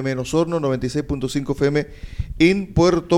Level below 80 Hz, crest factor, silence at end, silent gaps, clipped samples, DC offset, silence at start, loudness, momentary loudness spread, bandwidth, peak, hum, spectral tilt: -36 dBFS; 18 dB; 0 s; none; under 0.1%; under 0.1%; 0 s; -20 LUFS; 9 LU; 13 kHz; -2 dBFS; none; -6.5 dB/octave